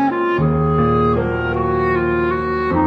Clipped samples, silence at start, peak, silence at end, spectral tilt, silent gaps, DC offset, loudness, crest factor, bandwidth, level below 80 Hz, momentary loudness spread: under 0.1%; 0 s; -4 dBFS; 0 s; -9.5 dB/octave; none; under 0.1%; -17 LUFS; 12 dB; 5.8 kHz; -32 dBFS; 4 LU